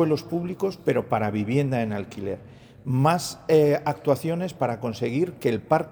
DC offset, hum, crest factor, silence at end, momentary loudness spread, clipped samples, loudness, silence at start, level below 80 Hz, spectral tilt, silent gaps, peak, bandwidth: under 0.1%; none; 18 dB; 0 s; 10 LU; under 0.1%; -25 LUFS; 0 s; -60 dBFS; -6.5 dB/octave; none; -6 dBFS; over 20 kHz